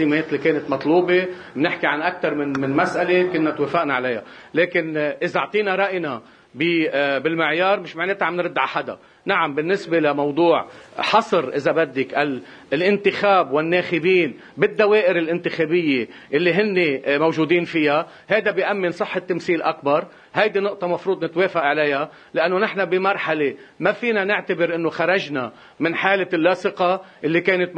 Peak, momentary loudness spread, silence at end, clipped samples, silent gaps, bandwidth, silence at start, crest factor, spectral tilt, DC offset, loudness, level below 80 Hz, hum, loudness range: 0 dBFS; 6 LU; 0 s; under 0.1%; none; 8.8 kHz; 0 s; 20 dB; -6.5 dB/octave; under 0.1%; -20 LUFS; -66 dBFS; none; 3 LU